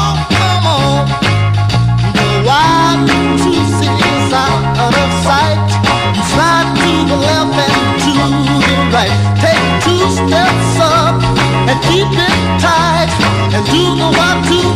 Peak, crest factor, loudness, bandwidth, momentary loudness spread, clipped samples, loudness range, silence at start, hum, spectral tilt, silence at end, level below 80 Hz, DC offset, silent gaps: 0 dBFS; 10 dB; -11 LUFS; 15.5 kHz; 2 LU; under 0.1%; 1 LU; 0 s; none; -5 dB/octave; 0 s; -26 dBFS; under 0.1%; none